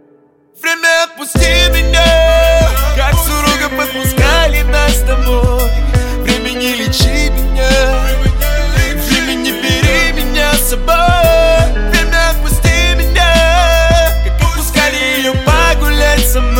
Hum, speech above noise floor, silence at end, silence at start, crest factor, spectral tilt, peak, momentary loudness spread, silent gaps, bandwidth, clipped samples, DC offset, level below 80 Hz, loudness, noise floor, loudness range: none; 38 dB; 0 s; 0.6 s; 10 dB; -4 dB/octave; 0 dBFS; 6 LU; none; 17 kHz; under 0.1%; under 0.1%; -14 dBFS; -11 LUFS; -48 dBFS; 3 LU